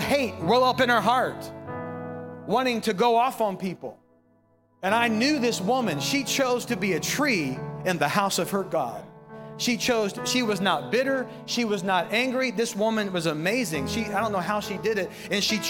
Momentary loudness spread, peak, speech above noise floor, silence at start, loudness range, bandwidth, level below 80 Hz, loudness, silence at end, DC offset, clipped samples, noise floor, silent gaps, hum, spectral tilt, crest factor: 12 LU; -6 dBFS; 38 dB; 0 s; 2 LU; 17.5 kHz; -62 dBFS; -25 LUFS; 0 s; under 0.1%; under 0.1%; -63 dBFS; none; none; -4 dB/octave; 20 dB